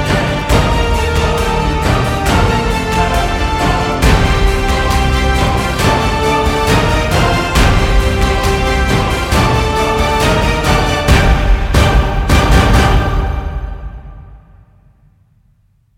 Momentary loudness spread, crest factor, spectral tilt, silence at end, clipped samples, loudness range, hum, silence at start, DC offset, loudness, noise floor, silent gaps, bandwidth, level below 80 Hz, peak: 4 LU; 12 dB; -5 dB/octave; 1.6 s; under 0.1%; 2 LU; none; 0 s; under 0.1%; -13 LUFS; -53 dBFS; none; 16.5 kHz; -16 dBFS; 0 dBFS